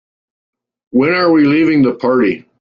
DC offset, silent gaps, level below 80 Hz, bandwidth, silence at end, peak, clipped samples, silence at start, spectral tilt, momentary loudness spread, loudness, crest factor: under 0.1%; none; -54 dBFS; 5.4 kHz; 0.2 s; -2 dBFS; under 0.1%; 0.95 s; -8.5 dB/octave; 5 LU; -12 LUFS; 12 dB